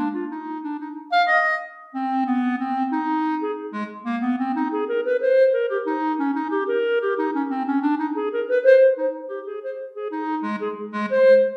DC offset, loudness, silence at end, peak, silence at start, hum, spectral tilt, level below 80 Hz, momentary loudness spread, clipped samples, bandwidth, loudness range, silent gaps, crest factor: under 0.1%; -22 LUFS; 0 s; -6 dBFS; 0 s; none; -6.5 dB/octave; -82 dBFS; 14 LU; under 0.1%; 6 kHz; 3 LU; none; 16 dB